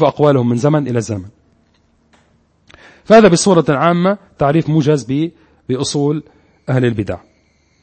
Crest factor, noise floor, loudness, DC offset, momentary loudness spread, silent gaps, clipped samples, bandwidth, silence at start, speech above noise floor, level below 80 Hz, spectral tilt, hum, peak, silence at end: 14 dB; -56 dBFS; -14 LUFS; under 0.1%; 15 LU; none; under 0.1%; 8.8 kHz; 0 s; 43 dB; -48 dBFS; -6 dB/octave; none; 0 dBFS; 0.65 s